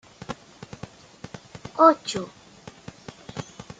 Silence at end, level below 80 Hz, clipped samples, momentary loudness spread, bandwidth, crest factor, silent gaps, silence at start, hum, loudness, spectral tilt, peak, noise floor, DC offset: 0.05 s; -60 dBFS; under 0.1%; 26 LU; 9.4 kHz; 24 dB; none; 0.3 s; none; -20 LUFS; -5 dB/octave; -2 dBFS; -47 dBFS; under 0.1%